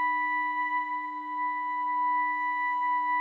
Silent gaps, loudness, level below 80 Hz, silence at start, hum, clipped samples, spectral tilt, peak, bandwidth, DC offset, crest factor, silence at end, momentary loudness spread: none; -29 LUFS; under -90 dBFS; 0 s; none; under 0.1%; -2 dB/octave; -20 dBFS; 4.2 kHz; under 0.1%; 8 dB; 0 s; 5 LU